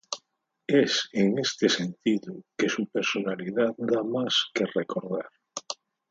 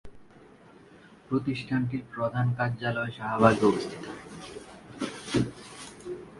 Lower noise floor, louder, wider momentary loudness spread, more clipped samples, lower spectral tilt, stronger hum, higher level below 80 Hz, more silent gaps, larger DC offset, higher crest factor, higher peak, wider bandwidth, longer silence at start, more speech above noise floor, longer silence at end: first, -72 dBFS vs -53 dBFS; about the same, -27 LUFS vs -28 LUFS; second, 14 LU vs 20 LU; neither; second, -4 dB/octave vs -6.5 dB/octave; neither; second, -74 dBFS vs -58 dBFS; neither; neither; second, 20 dB vs 26 dB; second, -8 dBFS vs -4 dBFS; second, 8 kHz vs 11.5 kHz; about the same, 0.1 s vs 0.05 s; first, 45 dB vs 26 dB; first, 0.4 s vs 0 s